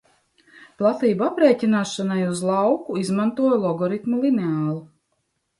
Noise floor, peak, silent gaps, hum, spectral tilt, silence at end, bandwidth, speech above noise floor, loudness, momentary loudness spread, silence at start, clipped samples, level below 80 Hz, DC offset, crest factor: -73 dBFS; -4 dBFS; none; none; -6.5 dB/octave; 0.75 s; 11.5 kHz; 52 dB; -21 LUFS; 6 LU; 0.8 s; under 0.1%; -68 dBFS; under 0.1%; 18 dB